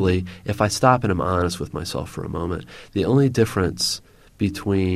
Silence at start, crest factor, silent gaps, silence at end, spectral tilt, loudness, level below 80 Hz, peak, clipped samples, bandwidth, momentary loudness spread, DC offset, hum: 0 s; 20 dB; none; 0 s; -5.5 dB/octave; -22 LUFS; -44 dBFS; -2 dBFS; under 0.1%; 15 kHz; 12 LU; under 0.1%; none